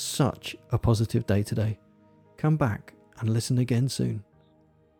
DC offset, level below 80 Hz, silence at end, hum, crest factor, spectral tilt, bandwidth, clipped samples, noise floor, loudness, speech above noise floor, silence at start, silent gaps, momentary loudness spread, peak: under 0.1%; -50 dBFS; 0.75 s; none; 16 dB; -6 dB/octave; 17.5 kHz; under 0.1%; -61 dBFS; -27 LUFS; 35 dB; 0 s; none; 10 LU; -10 dBFS